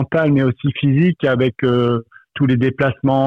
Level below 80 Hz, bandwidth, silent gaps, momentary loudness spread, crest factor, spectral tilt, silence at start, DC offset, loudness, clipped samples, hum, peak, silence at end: -50 dBFS; 4.8 kHz; none; 5 LU; 10 dB; -9.5 dB/octave; 0 s; under 0.1%; -17 LUFS; under 0.1%; none; -6 dBFS; 0 s